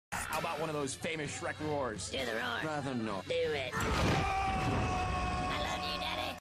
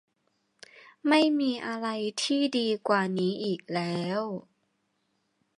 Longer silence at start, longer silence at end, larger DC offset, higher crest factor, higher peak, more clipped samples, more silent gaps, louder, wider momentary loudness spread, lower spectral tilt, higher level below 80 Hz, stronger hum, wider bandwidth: second, 0.1 s vs 0.75 s; second, 0 s vs 1.2 s; neither; second, 12 dB vs 20 dB; second, -22 dBFS vs -10 dBFS; neither; neither; second, -35 LUFS vs -28 LUFS; second, 5 LU vs 9 LU; about the same, -4.5 dB/octave vs -5 dB/octave; first, -46 dBFS vs -80 dBFS; neither; first, 15 kHz vs 11.5 kHz